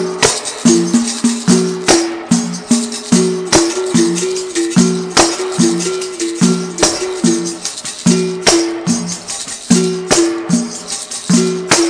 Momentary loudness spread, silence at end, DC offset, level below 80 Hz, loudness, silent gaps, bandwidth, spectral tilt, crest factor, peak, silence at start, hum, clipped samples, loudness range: 8 LU; 0 s; under 0.1%; -44 dBFS; -14 LUFS; none; 11 kHz; -3.5 dB/octave; 14 dB; 0 dBFS; 0 s; none; under 0.1%; 2 LU